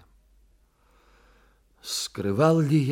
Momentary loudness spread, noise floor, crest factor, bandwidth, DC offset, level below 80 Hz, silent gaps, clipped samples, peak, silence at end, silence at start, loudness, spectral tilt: 11 LU; -62 dBFS; 20 dB; 16.5 kHz; under 0.1%; -62 dBFS; none; under 0.1%; -6 dBFS; 0 s; 1.85 s; -24 LUFS; -6 dB/octave